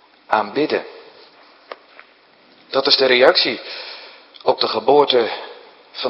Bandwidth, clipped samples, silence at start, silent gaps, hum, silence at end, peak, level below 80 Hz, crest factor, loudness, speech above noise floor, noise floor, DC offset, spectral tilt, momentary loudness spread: 6.6 kHz; under 0.1%; 0.3 s; none; none; 0 s; 0 dBFS; -68 dBFS; 20 dB; -16 LUFS; 35 dB; -51 dBFS; under 0.1%; -5 dB/octave; 24 LU